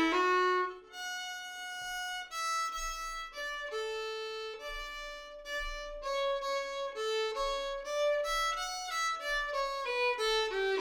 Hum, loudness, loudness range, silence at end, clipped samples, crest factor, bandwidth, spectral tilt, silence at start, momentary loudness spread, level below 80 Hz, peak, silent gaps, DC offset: none; -34 LUFS; 6 LU; 0 s; under 0.1%; 16 dB; 19 kHz; -1 dB/octave; 0 s; 10 LU; -54 dBFS; -18 dBFS; none; under 0.1%